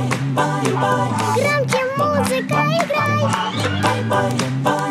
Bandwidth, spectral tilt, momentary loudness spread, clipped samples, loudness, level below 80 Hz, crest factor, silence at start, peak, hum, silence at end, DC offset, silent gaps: 15.5 kHz; -5 dB/octave; 2 LU; under 0.1%; -18 LUFS; -56 dBFS; 16 dB; 0 s; -2 dBFS; none; 0 s; under 0.1%; none